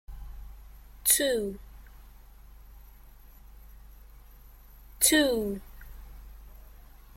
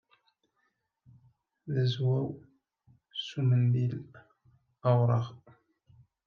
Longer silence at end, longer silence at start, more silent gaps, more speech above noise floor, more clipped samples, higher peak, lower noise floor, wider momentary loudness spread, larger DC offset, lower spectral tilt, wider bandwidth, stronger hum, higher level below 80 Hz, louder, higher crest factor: second, 0.5 s vs 0.9 s; second, 0.1 s vs 1.65 s; neither; second, 24 dB vs 50 dB; neither; first, -8 dBFS vs -14 dBFS; second, -51 dBFS vs -78 dBFS; first, 28 LU vs 16 LU; neither; second, -2 dB/octave vs -8.5 dB/octave; first, 16.5 kHz vs 6.6 kHz; neither; first, -48 dBFS vs -74 dBFS; first, -25 LUFS vs -30 LUFS; first, 26 dB vs 18 dB